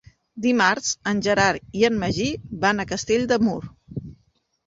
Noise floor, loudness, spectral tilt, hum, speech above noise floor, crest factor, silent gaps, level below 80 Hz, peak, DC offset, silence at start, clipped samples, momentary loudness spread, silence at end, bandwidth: -65 dBFS; -22 LUFS; -4 dB/octave; none; 44 dB; 18 dB; none; -50 dBFS; -4 dBFS; under 0.1%; 0.35 s; under 0.1%; 15 LU; 0.55 s; 8 kHz